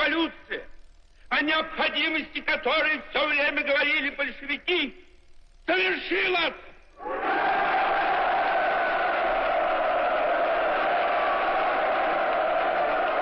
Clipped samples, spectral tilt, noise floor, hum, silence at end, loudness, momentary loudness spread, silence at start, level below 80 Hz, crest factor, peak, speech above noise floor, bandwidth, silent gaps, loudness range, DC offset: under 0.1%; -5 dB/octave; -50 dBFS; none; 0 s; -24 LUFS; 6 LU; 0 s; -52 dBFS; 14 dB; -12 dBFS; 24 dB; 6 kHz; none; 2 LU; under 0.1%